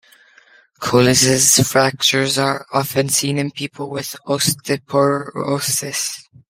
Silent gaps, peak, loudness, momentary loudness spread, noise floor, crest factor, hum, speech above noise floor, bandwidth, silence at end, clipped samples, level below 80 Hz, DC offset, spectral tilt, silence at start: none; 0 dBFS; -16 LUFS; 14 LU; -51 dBFS; 18 dB; none; 33 dB; 16.5 kHz; 0.3 s; under 0.1%; -54 dBFS; under 0.1%; -3 dB/octave; 0.8 s